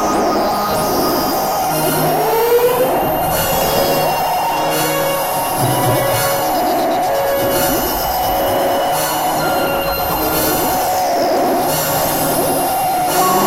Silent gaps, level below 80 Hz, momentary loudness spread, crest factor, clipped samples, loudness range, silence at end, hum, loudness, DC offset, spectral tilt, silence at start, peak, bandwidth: none; -38 dBFS; 2 LU; 12 dB; under 0.1%; 1 LU; 0 s; none; -15 LUFS; under 0.1%; -3.5 dB/octave; 0 s; -4 dBFS; 16 kHz